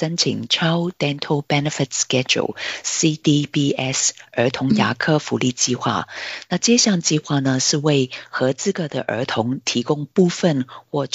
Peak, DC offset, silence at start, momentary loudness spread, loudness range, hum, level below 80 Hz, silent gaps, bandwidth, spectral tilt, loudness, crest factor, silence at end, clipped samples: -4 dBFS; under 0.1%; 0 s; 7 LU; 1 LU; none; -62 dBFS; none; 8.2 kHz; -4 dB/octave; -19 LUFS; 16 dB; 0.1 s; under 0.1%